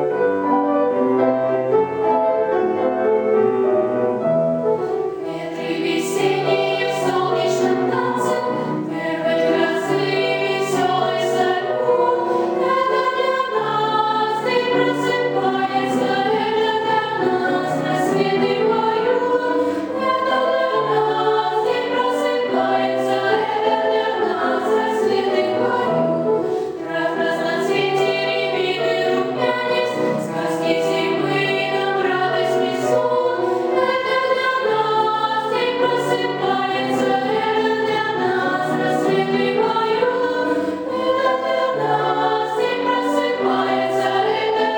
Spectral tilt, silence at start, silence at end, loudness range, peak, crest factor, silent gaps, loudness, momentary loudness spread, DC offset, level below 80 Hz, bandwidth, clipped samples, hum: -5 dB/octave; 0 s; 0 s; 1 LU; -4 dBFS; 14 dB; none; -19 LUFS; 3 LU; under 0.1%; -66 dBFS; 18 kHz; under 0.1%; none